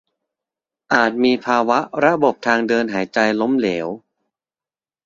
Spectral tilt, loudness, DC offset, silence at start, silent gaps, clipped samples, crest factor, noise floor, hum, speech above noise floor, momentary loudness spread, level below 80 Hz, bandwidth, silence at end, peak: -5 dB/octave; -18 LUFS; under 0.1%; 0.9 s; none; under 0.1%; 18 dB; under -90 dBFS; none; over 73 dB; 6 LU; -62 dBFS; 7.6 kHz; 1.05 s; -2 dBFS